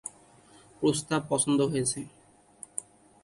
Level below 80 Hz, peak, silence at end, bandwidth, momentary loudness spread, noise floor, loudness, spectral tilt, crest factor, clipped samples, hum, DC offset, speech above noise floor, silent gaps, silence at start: -64 dBFS; -10 dBFS; 0.4 s; 11.5 kHz; 17 LU; -57 dBFS; -29 LUFS; -4.5 dB/octave; 20 dB; under 0.1%; none; under 0.1%; 29 dB; none; 0.05 s